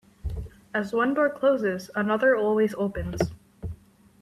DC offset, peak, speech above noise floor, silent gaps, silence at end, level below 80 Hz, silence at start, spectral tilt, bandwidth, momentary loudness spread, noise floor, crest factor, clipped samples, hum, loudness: under 0.1%; -8 dBFS; 24 dB; none; 0.45 s; -44 dBFS; 0.25 s; -6.5 dB/octave; 14 kHz; 18 LU; -48 dBFS; 18 dB; under 0.1%; none; -25 LUFS